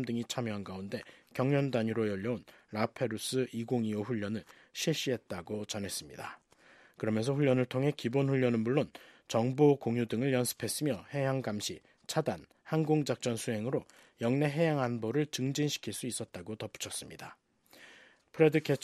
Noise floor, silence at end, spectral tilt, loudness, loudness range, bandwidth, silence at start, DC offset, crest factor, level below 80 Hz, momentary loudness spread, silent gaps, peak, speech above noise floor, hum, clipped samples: -61 dBFS; 0.05 s; -5.5 dB/octave; -33 LUFS; 6 LU; 14 kHz; 0 s; under 0.1%; 22 dB; -72 dBFS; 13 LU; none; -10 dBFS; 29 dB; none; under 0.1%